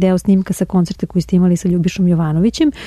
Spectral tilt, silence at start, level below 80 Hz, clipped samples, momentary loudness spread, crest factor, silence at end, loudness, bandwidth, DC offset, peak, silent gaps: -7.5 dB/octave; 0 s; -38 dBFS; under 0.1%; 4 LU; 10 dB; 0 s; -15 LUFS; 13.5 kHz; under 0.1%; -4 dBFS; none